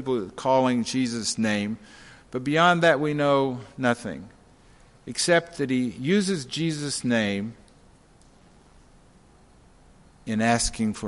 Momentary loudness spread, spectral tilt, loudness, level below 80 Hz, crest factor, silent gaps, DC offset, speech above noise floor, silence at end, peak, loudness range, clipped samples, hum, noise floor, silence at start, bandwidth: 13 LU; -4.5 dB/octave; -24 LUFS; -52 dBFS; 20 dB; none; under 0.1%; 31 dB; 0 s; -6 dBFS; 8 LU; under 0.1%; none; -55 dBFS; 0 s; 11.5 kHz